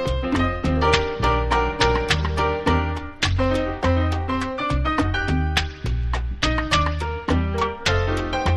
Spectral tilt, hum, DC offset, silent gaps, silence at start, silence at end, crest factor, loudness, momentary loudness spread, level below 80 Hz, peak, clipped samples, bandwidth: -5.5 dB/octave; none; under 0.1%; none; 0 s; 0 s; 18 dB; -22 LUFS; 5 LU; -28 dBFS; -4 dBFS; under 0.1%; 12 kHz